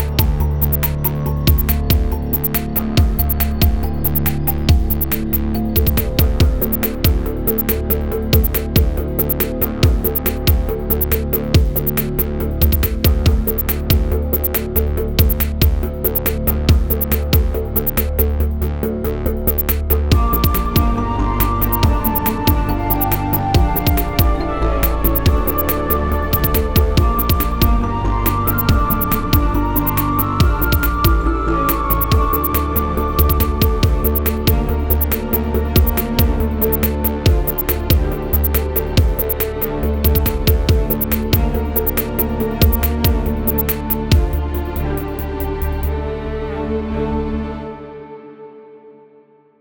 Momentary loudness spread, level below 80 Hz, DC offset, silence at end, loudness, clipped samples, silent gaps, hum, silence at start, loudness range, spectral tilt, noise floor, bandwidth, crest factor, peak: 4 LU; -20 dBFS; under 0.1%; 0 s; -17 LUFS; under 0.1%; none; none; 0 s; 2 LU; -6 dB/octave; -49 dBFS; over 20 kHz; 16 dB; 0 dBFS